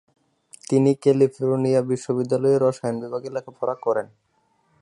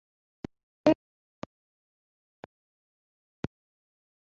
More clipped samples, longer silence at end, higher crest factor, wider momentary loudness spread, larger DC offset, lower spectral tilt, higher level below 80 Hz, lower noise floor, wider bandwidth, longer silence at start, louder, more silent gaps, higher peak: neither; second, 0.75 s vs 3.3 s; second, 16 dB vs 28 dB; second, 11 LU vs 27 LU; neither; first, -7.5 dB/octave vs -6 dB/octave; second, -70 dBFS vs -64 dBFS; second, -66 dBFS vs under -90 dBFS; first, 11.5 kHz vs 6.6 kHz; second, 0.7 s vs 0.85 s; first, -22 LUFS vs -30 LUFS; neither; about the same, -6 dBFS vs -8 dBFS